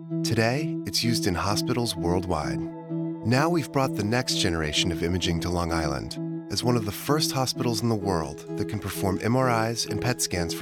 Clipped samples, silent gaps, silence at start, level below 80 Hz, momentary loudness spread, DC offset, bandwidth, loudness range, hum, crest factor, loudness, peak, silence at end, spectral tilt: under 0.1%; none; 0 s; -46 dBFS; 7 LU; under 0.1%; 19 kHz; 1 LU; none; 16 dB; -26 LUFS; -10 dBFS; 0 s; -4.5 dB/octave